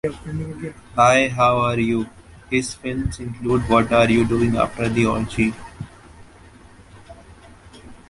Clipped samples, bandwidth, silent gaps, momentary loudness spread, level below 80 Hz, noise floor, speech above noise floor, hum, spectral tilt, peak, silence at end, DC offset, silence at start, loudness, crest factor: under 0.1%; 11.5 kHz; none; 16 LU; -40 dBFS; -46 dBFS; 26 dB; none; -6 dB/octave; -2 dBFS; 0.15 s; under 0.1%; 0.05 s; -20 LUFS; 18 dB